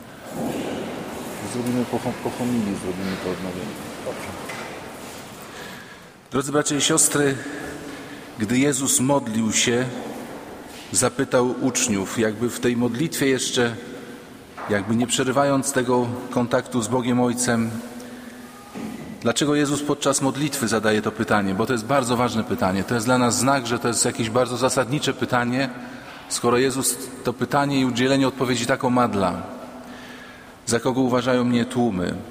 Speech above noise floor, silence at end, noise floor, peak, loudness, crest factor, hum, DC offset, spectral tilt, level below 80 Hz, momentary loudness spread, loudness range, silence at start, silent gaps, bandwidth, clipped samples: 22 dB; 0 s; -43 dBFS; -4 dBFS; -22 LUFS; 20 dB; none; under 0.1%; -4 dB/octave; -54 dBFS; 17 LU; 6 LU; 0 s; none; 16 kHz; under 0.1%